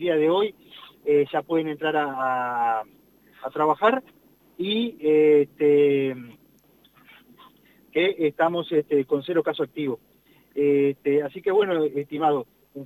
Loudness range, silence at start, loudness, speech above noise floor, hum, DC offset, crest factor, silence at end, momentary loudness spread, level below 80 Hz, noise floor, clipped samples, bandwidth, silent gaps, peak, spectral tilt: 4 LU; 0 s; -23 LUFS; 36 dB; none; under 0.1%; 16 dB; 0 s; 11 LU; -72 dBFS; -59 dBFS; under 0.1%; 13 kHz; none; -8 dBFS; -7.5 dB/octave